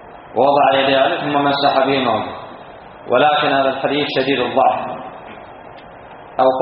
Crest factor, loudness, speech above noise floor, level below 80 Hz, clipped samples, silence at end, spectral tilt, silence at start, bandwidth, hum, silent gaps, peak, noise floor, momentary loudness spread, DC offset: 16 dB; -16 LUFS; 22 dB; -56 dBFS; under 0.1%; 0 s; -2 dB/octave; 0 s; 5.2 kHz; none; none; 0 dBFS; -37 dBFS; 22 LU; under 0.1%